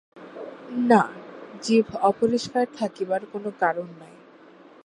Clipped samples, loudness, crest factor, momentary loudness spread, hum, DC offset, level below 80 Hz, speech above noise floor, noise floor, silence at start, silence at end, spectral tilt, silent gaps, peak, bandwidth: under 0.1%; -24 LUFS; 22 dB; 20 LU; none; under 0.1%; -68 dBFS; 27 dB; -50 dBFS; 0.15 s; 0.8 s; -5.5 dB/octave; none; -4 dBFS; 11 kHz